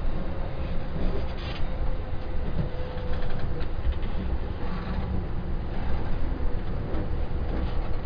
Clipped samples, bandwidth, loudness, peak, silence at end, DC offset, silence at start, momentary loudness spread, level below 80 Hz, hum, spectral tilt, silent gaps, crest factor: under 0.1%; 5.2 kHz; -33 LUFS; -12 dBFS; 0 s; under 0.1%; 0 s; 2 LU; -28 dBFS; none; -9 dB/octave; none; 12 dB